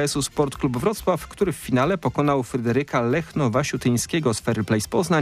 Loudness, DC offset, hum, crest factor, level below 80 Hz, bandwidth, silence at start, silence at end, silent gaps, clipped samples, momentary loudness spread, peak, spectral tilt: -23 LUFS; under 0.1%; none; 16 dB; -46 dBFS; 15.5 kHz; 0 s; 0 s; none; under 0.1%; 3 LU; -6 dBFS; -5.5 dB/octave